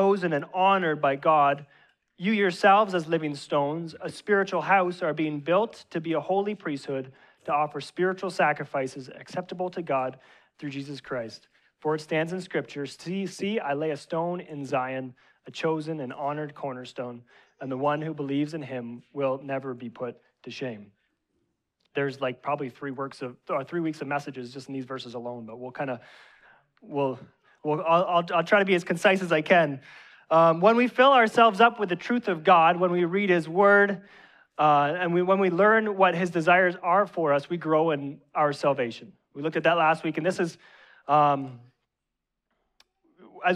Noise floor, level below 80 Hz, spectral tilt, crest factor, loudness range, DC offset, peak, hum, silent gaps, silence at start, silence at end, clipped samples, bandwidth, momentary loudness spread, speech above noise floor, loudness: -84 dBFS; -76 dBFS; -6 dB/octave; 20 dB; 12 LU; under 0.1%; -6 dBFS; none; none; 0 s; 0 s; under 0.1%; 12.5 kHz; 17 LU; 59 dB; -25 LUFS